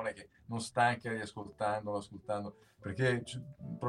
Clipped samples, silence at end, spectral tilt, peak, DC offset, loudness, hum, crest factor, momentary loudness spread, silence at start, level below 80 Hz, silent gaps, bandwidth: under 0.1%; 0 s; -5.5 dB/octave; -16 dBFS; under 0.1%; -36 LUFS; none; 22 dB; 15 LU; 0 s; -68 dBFS; none; 12 kHz